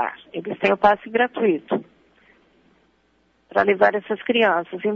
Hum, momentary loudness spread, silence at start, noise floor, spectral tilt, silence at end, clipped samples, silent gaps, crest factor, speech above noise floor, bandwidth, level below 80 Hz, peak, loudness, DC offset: none; 10 LU; 0 s; -63 dBFS; -6.5 dB/octave; 0 s; under 0.1%; none; 20 dB; 43 dB; 6.8 kHz; -62 dBFS; -2 dBFS; -20 LUFS; under 0.1%